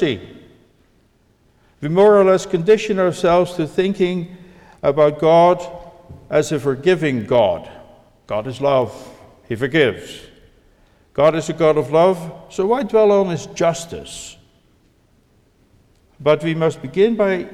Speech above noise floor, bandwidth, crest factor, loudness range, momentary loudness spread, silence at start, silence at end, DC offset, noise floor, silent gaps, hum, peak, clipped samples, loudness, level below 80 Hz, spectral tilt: 41 dB; 13 kHz; 16 dB; 6 LU; 16 LU; 0 s; 0 s; under 0.1%; -57 dBFS; none; none; -4 dBFS; under 0.1%; -17 LUFS; -52 dBFS; -6 dB/octave